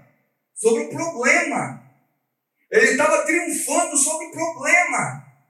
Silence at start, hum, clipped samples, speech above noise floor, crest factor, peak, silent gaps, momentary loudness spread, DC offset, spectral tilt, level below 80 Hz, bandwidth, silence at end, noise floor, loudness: 0.55 s; none; under 0.1%; 54 dB; 18 dB; -4 dBFS; none; 11 LU; under 0.1%; -2.5 dB/octave; -80 dBFS; 15 kHz; 0.3 s; -74 dBFS; -19 LUFS